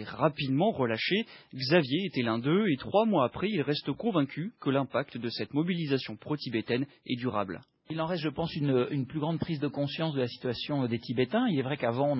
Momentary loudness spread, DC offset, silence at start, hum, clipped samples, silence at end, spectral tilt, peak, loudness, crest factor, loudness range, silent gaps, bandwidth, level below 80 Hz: 7 LU; under 0.1%; 0 s; none; under 0.1%; 0 s; -10.5 dB/octave; -10 dBFS; -30 LUFS; 20 dB; 4 LU; none; 5.8 kHz; -62 dBFS